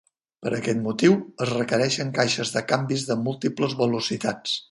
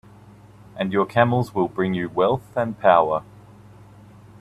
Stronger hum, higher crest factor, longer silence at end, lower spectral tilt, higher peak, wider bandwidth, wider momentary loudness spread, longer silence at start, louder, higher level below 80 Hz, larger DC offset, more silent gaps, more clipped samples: neither; about the same, 20 dB vs 22 dB; second, 0.1 s vs 1.2 s; second, -4.5 dB/octave vs -8 dB/octave; second, -6 dBFS vs -2 dBFS; second, 11.5 kHz vs 13.5 kHz; second, 7 LU vs 10 LU; second, 0.4 s vs 0.75 s; second, -24 LUFS vs -21 LUFS; second, -64 dBFS vs -56 dBFS; neither; neither; neither